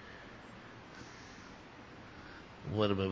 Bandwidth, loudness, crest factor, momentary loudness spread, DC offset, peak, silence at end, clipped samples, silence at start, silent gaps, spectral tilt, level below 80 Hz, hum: 7.8 kHz; -42 LUFS; 24 dB; 18 LU; under 0.1%; -18 dBFS; 0 s; under 0.1%; 0 s; none; -6.5 dB/octave; -60 dBFS; none